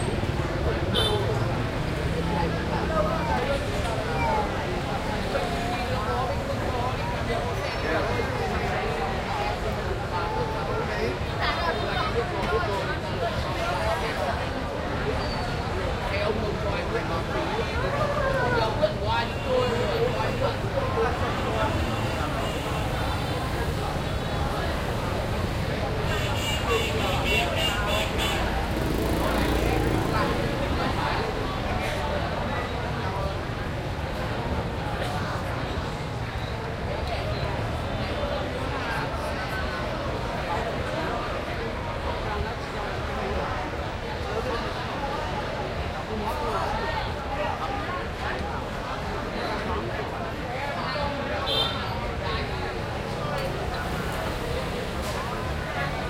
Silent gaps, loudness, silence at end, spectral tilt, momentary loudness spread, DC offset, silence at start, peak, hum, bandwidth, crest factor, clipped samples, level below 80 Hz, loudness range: none; -27 LUFS; 0 s; -5.5 dB/octave; 6 LU; under 0.1%; 0 s; -10 dBFS; none; 16 kHz; 16 dB; under 0.1%; -36 dBFS; 4 LU